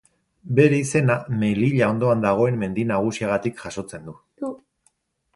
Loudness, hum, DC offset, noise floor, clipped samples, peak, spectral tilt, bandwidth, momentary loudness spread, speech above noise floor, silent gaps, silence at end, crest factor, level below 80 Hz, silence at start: -21 LUFS; none; under 0.1%; -66 dBFS; under 0.1%; -2 dBFS; -7 dB/octave; 11.5 kHz; 15 LU; 46 dB; none; 0.8 s; 20 dB; -56 dBFS; 0.45 s